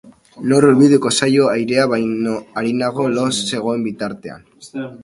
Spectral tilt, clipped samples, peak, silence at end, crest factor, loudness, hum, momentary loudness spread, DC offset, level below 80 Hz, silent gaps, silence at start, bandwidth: -5 dB/octave; under 0.1%; 0 dBFS; 0.05 s; 16 dB; -16 LUFS; none; 16 LU; under 0.1%; -58 dBFS; none; 0.05 s; 11.5 kHz